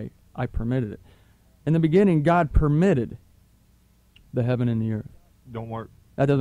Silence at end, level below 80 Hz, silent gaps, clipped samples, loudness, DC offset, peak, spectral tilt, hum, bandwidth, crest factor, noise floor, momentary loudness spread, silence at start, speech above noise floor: 0 s; -36 dBFS; none; under 0.1%; -23 LUFS; under 0.1%; -8 dBFS; -9 dB/octave; none; 10.5 kHz; 16 dB; -59 dBFS; 19 LU; 0 s; 37 dB